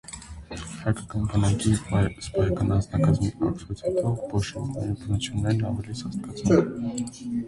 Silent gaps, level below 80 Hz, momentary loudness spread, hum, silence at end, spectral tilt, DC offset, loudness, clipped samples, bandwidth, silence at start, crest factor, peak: none; -42 dBFS; 11 LU; none; 0 s; -6.5 dB/octave; under 0.1%; -26 LUFS; under 0.1%; 11.5 kHz; 0.05 s; 20 dB; -6 dBFS